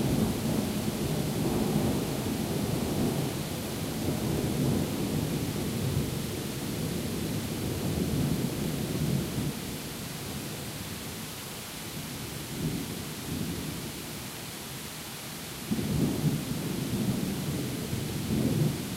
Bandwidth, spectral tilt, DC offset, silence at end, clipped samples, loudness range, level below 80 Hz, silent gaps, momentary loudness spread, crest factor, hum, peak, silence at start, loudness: 16 kHz; -5 dB/octave; under 0.1%; 0 s; under 0.1%; 5 LU; -48 dBFS; none; 9 LU; 18 dB; none; -14 dBFS; 0 s; -32 LUFS